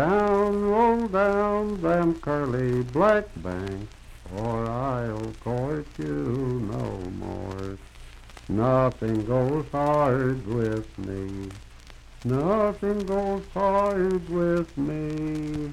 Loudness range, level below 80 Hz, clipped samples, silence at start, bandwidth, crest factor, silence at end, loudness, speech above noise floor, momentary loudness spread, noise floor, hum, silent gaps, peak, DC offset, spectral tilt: 6 LU; -44 dBFS; under 0.1%; 0 s; 13 kHz; 18 dB; 0 s; -26 LUFS; 20 dB; 13 LU; -46 dBFS; none; none; -8 dBFS; under 0.1%; -8 dB/octave